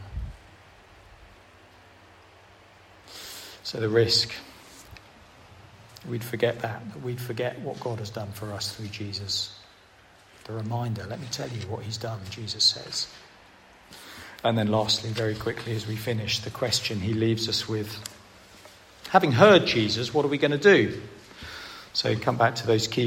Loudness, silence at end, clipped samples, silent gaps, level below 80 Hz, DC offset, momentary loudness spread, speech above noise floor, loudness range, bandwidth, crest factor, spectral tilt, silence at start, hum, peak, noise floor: -25 LUFS; 0 s; under 0.1%; none; -54 dBFS; under 0.1%; 19 LU; 29 dB; 11 LU; 16 kHz; 24 dB; -4.5 dB/octave; 0 s; none; -4 dBFS; -55 dBFS